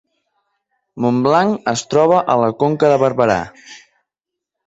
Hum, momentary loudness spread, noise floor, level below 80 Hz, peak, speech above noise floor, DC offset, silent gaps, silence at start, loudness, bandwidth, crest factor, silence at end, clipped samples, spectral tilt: none; 7 LU; -83 dBFS; -54 dBFS; -2 dBFS; 68 dB; under 0.1%; none; 0.95 s; -15 LUFS; 8 kHz; 16 dB; 0.9 s; under 0.1%; -6 dB/octave